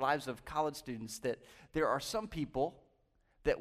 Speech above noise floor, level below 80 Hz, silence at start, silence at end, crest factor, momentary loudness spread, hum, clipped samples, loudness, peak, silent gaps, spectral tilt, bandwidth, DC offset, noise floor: 36 dB; -58 dBFS; 0 s; 0 s; 18 dB; 8 LU; none; under 0.1%; -38 LUFS; -18 dBFS; none; -4.5 dB/octave; 15.5 kHz; under 0.1%; -73 dBFS